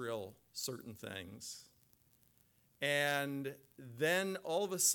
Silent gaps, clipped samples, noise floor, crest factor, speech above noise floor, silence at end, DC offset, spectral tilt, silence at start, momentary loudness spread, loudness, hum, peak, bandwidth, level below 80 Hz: none; under 0.1%; -72 dBFS; 20 dB; 33 dB; 0 s; under 0.1%; -2.5 dB/octave; 0 s; 15 LU; -38 LUFS; none; -20 dBFS; 19 kHz; -80 dBFS